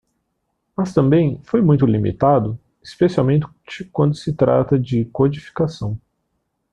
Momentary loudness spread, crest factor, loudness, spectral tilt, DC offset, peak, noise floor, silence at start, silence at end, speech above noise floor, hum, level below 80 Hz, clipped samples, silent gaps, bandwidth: 13 LU; 16 dB; -18 LUFS; -9 dB/octave; under 0.1%; -2 dBFS; -72 dBFS; 0.8 s; 0.75 s; 55 dB; none; -48 dBFS; under 0.1%; none; 9.2 kHz